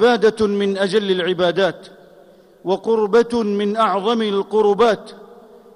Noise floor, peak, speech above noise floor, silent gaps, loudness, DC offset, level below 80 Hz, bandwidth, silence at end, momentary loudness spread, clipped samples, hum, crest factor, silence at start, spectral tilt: -48 dBFS; -6 dBFS; 31 dB; none; -18 LUFS; under 0.1%; -56 dBFS; 11 kHz; 0.4 s; 7 LU; under 0.1%; none; 12 dB; 0 s; -5.5 dB/octave